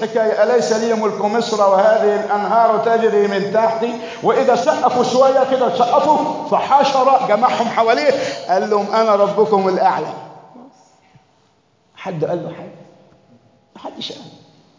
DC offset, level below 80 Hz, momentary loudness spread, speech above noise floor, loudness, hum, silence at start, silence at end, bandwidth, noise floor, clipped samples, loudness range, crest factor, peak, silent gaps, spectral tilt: under 0.1%; -68 dBFS; 15 LU; 43 dB; -15 LUFS; none; 0 s; 0.5 s; 7.6 kHz; -58 dBFS; under 0.1%; 15 LU; 14 dB; -2 dBFS; none; -5 dB/octave